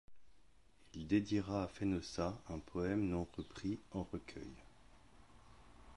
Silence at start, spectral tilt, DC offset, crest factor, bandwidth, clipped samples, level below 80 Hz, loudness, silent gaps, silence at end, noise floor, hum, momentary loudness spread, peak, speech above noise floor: 0.1 s; -6.5 dB/octave; under 0.1%; 20 dB; 11.5 kHz; under 0.1%; -60 dBFS; -41 LUFS; none; 0 s; -69 dBFS; none; 15 LU; -22 dBFS; 29 dB